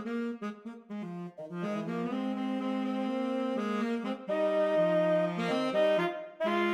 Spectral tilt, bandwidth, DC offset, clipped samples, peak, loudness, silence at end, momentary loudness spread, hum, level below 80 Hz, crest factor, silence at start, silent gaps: -6.5 dB/octave; 11.5 kHz; under 0.1%; under 0.1%; -18 dBFS; -31 LUFS; 0 s; 14 LU; none; -84 dBFS; 14 dB; 0 s; none